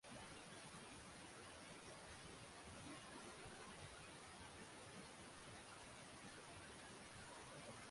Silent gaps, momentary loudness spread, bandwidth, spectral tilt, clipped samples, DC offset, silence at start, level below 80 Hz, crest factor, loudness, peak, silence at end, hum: none; 1 LU; 11.5 kHz; -3 dB/octave; under 0.1%; under 0.1%; 0.05 s; -74 dBFS; 14 dB; -58 LUFS; -44 dBFS; 0 s; none